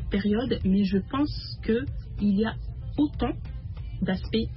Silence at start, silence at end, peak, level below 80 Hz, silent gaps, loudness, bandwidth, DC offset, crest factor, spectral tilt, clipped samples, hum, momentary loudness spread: 0 s; 0 s; -14 dBFS; -38 dBFS; none; -28 LUFS; 5.8 kHz; under 0.1%; 14 dB; -11.5 dB/octave; under 0.1%; none; 12 LU